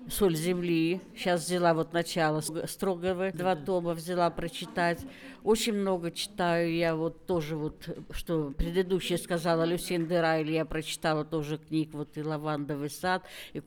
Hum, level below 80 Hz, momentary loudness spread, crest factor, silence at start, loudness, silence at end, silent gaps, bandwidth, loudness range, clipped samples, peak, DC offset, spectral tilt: none; -50 dBFS; 8 LU; 16 dB; 0 s; -30 LUFS; 0.05 s; none; 20 kHz; 2 LU; under 0.1%; -14 dBFS; under 0.1%; -5 dB/octave